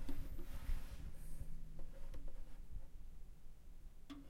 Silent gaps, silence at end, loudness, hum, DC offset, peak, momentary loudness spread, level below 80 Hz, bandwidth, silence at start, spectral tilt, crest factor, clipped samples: none; 0 s; -56 LUFS; none; under 0.1%; -30 dBFS; 13 LU; -48 dBFS; 14.5 kHz; 0 s; -6 dB/octave; 14 dB; under 0.1%